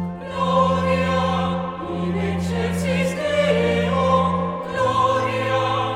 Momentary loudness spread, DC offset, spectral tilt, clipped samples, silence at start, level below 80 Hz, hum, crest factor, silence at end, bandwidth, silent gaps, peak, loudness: 6 LU; under 0.1%; -6.5 dB/octave; under 0.1%; 0 s; -44 dBFS; none; 16 dB; 0 s; 12.5 kHz; none; -6 dBFS; -21 LUFS